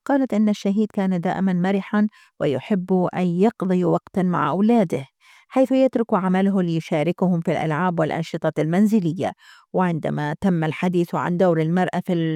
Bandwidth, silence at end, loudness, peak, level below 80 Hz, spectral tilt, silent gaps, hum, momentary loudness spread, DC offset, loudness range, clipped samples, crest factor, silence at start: 12.5 kHz; 0 s; -21 LUFS; -6 dBFS; -64 dBFS; -8 dB/octave; none; none; 6 LU; under 0.1%; 2 LU; under 0.1%; 14 dB; 0.1 s